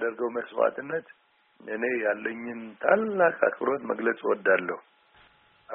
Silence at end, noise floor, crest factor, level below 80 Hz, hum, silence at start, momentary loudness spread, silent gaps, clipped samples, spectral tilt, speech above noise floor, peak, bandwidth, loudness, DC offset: 0 s; -60 dBFS; 22 dB; -76 dBFS; none; 0 s; 13 LU; none; under 0.1%; -4 dB/octave; 33 dB; -6 dBFS; 3.8 kHz; -27 LUFS; under 0.1%